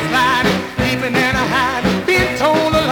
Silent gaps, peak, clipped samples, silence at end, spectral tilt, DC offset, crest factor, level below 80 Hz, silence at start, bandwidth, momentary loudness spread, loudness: none; -4 dBFS; under 0.1%; 0 s; -4.5 dB/octave; under 0.1%; 12 dB; -36 dBFS; 0 s; over 20 kHz; 4 LU; -15 LUFS